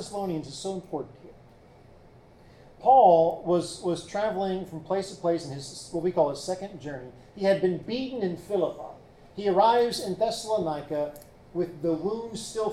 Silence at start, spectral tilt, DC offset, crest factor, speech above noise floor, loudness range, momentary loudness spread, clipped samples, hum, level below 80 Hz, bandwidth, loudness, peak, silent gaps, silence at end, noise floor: 0 s; -5.5 dB/octave; under 0.1%; 20 dB; 27 dB; 5 LU; 16 LU; under 0.1%; none; -58 dBFS; 14.5 kHz; -27 LUFS; -8 dBFS; none; 0 s; -53 dBFS